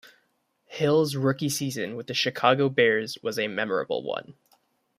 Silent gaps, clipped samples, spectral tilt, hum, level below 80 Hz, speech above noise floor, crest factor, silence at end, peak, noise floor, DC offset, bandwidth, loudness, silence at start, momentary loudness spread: none; under 0.1%; -4.5 dB/octave; none; -70 dBFS; 46 dB; 22 dB; 0.65 s; -6 dBFS; -71 dBFS; under 0.1%; 15.5 kHz; -25 LUFS; 0.7 s; 10 LU